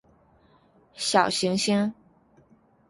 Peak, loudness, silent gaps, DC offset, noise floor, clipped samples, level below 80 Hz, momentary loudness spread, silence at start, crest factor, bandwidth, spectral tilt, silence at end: -4 dBFS; -24 LUFS; none; under 0.1%; -60 dBFS; under 0.1%; -66 dBFS; 8 LU; 0.95 s; 24 dB; 11.5 kHz; -3.5 dB/octave; 0.95 s